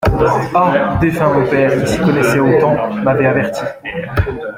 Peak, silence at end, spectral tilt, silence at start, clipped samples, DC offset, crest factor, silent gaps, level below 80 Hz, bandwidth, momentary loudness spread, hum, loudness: -2 dBFS; 0 s; -7 dB/octave; 0 s; under 0.1%; under 0.1%; 12 dB; none; -32 dBFS; 16.5 kHz; 8 LU; none; -14 LUFS